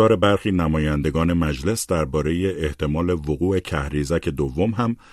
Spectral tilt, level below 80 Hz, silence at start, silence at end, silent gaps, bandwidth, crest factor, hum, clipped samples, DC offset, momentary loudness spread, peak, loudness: -6.5 dB/octave; -34 dBFS; 0 s; 0.2 s; none; 13.5 kHz; 16 dB; none; under 0.1%; under 0.1%; 5 LU; -4 dBFS; -22 LUFS